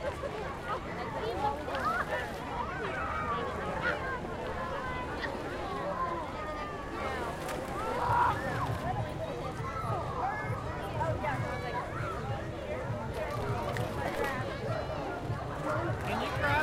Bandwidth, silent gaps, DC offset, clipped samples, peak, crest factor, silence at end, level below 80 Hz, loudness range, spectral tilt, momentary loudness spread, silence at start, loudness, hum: 16 kHz; none; under 0.1%; under 0.1%; -16 dBFS; 18 dB; 0 s; -48 dBFS; 2 LU; -6 dB/octave; 5 LU; 0 s; -34 LUFS; none